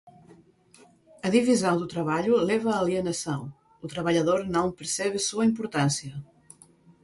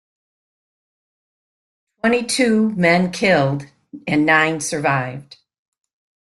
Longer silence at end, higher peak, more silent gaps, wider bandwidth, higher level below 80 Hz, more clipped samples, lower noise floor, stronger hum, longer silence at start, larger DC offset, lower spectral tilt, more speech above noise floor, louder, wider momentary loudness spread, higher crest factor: second, 0.8 s vs 1 s; second, -8 dBFS vs -2 dBFS; neither; about the same, 11.5 kHz vs 12.5 kHz; about the same, -62 dBFS vs -58 dBFS; neither; second, -57 dBFS vs under -90 dBFS; neither; second, 0.05 s vs 2.05 s; neither; about the same, -5 dB/octave vs -5 dB/octave; second, 32 dB vs over 73 dB; second, -26 LUFS vs -17 LUFS; about the same, 11 LU vs 12 LU; about the same, 20 dB vs 18 dB